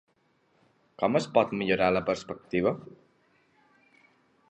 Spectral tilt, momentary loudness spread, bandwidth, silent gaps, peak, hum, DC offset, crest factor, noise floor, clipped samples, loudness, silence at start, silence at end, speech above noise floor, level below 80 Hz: -6 dB/octave; 8 LU; 9.6 kHz; none; -8 dBFS; none; under 0.1%; 22 dB; -69 dBFS; under 0.1%; -28 LUFS; 1 s; 1.6 s; 42 dB; -62 dBFS